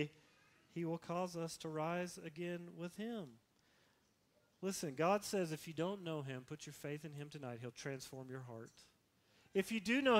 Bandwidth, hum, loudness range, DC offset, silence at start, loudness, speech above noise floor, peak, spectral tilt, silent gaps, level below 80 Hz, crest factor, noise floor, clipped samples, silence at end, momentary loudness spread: 16 kHz; none; 6 LU; under 0.1%; 0 s; -43 LUFS; 35 dB; -18 dBFS; -5 dB/octave; none; -80 dBFS; 24 dB; -76 dBFS; under 0.1%; 0 s; 13 LU